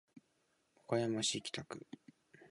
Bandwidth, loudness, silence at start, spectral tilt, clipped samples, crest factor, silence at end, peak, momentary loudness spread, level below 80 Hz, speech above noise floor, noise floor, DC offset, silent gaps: 11 kHz; -38 LUFS; 0.15 s; -3.5 dB/octave; under 0.1%; 22 dB; 0.05 s; -20 dBFS; 20 LU; -78 dBFS; 40 dB; -79 dBFS; under 0.1%; none